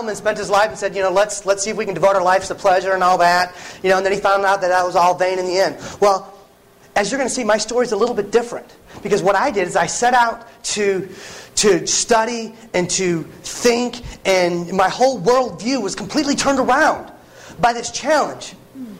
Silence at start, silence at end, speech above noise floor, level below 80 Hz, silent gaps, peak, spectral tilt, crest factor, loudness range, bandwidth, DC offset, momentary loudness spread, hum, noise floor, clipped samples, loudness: 0 s; 0 s; 31 dB; -50 dBFS; none; -4 dBFS; -3 dB/octave; 14 dB; 3 LU; 16 kHz; under 0.1%; 9 LU; none; -48 dBFS; under 0.1%; -17 LUFS